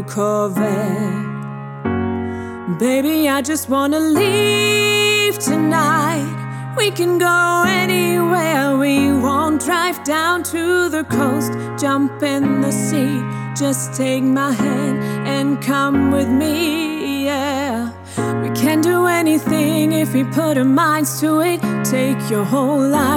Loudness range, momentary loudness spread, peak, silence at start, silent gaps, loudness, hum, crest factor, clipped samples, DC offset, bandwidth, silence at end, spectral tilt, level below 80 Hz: 3 LU; 8 LU; -2 dBFS; 0 s; none; -17 LUFS; none; 14 dB; under 0.1%; under 0.1%; 18.5 kHz; 0 s; -4.5 dB/octave; -56 dBFS